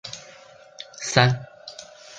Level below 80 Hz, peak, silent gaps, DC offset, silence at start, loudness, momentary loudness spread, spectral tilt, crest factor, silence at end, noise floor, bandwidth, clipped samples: -56 dBFS; -2 dBFS; none; under 0.1%; 0.05 s; -22 LUFS; 22 LU; -4 dB/octave; 24 dB; 0 s; -48 dBFS; 9.4 kHz; under 0.1%